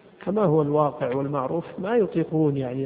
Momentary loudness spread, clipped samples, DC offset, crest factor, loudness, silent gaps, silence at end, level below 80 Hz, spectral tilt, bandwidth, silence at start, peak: 7 LU; under 0.1%; under 0.1%; 16 dB; -24 LUFS; none; 0 s; -60 dBFS; -13 dB/octave; 4 kHz; 0.2 s; -8 dBFS